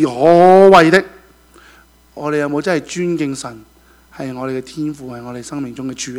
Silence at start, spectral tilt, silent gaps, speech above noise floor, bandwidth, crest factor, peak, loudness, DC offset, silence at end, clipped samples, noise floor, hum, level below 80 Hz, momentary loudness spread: 0 s; -5.5 dB/octave; none; 33 dB; 14 kHz; 14 dB; 0 dBFS; -13 LUFS; under 0.1%; 0 s; 0.4%; -47 dBFS; none; -50 dBFS; 22 LU